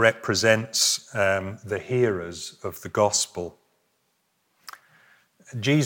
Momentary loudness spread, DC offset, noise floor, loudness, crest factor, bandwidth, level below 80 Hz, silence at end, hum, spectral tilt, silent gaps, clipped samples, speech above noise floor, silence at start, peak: 18 LU; under 0.1%; -71 dBFS; -24 LUFS; 22 dB; 17 kHz; -68 dBFS; 0 s; none; -3.5 dB/octave; none; under 0.1%; 47 dB; 0 s; -4 dBFS